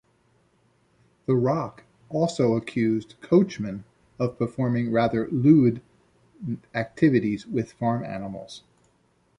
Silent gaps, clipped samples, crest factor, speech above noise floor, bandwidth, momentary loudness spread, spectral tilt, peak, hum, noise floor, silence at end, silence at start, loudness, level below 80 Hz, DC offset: none; under 0.1%; 20 dB; 42 dB; 10.5 kHz; 16 LU; -8 dB/octave; -6 dBFS; none; -65 dBFS; 0.8 s; 1.3 s; -24 LUFS; -60 dBFS; under 0.1%